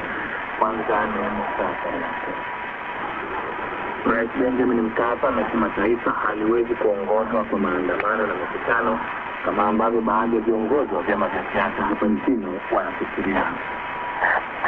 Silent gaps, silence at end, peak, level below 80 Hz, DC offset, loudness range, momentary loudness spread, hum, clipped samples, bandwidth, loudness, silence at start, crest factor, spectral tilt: none; 0 s; -2 dBFS; -50 dBFS; under 0.1%; 4 LU; 7 LU; none; under 0.1%; 4.9 kHz; -23 LUFS; 0 s; 20 dB; -8 dB/octave